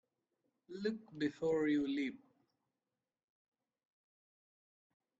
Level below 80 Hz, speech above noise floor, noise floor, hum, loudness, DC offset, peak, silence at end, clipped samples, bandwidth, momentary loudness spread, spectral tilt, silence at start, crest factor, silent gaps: -80 dBFS; over 53 dB; under -90 dBFS; none; -38 LUFS; under 0.1%; -24 dBFS; 3.05 s; under 0.1%; 7.8 kHz; 9 LU; -6.5 dB/octave; 0.7 s; 18 dB; none